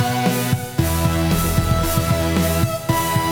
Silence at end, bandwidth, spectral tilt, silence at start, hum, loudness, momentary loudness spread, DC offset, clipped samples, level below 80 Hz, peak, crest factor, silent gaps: 0 s; over 20 kHz; -5 dB/octave; 0 s; none; -19 LUFS; 2 LU; under 0.1%; under 0.1%; -30 dBFS; -6 dBFS; 14 dB; none